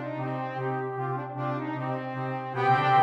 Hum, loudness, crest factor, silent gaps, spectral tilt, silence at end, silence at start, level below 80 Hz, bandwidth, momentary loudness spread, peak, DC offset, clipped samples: none; -29 LUFS; 18 dB; none; -8 dB/octave; 0 s; 0 s; -74 dBFS; 7.4 kHz; 8 LU; -10 dBFS; under 0.1%; under 0.1%